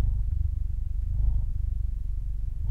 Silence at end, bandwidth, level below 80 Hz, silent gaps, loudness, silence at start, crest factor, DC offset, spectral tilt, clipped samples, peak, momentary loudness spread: 0 s; 1 kHz; -28 dBFS; none; -32 LUFS; 0 s; 12 dB; under 0.1%; -9.5 dB/octave; under 0.1%; -14 dBFS; 5 LU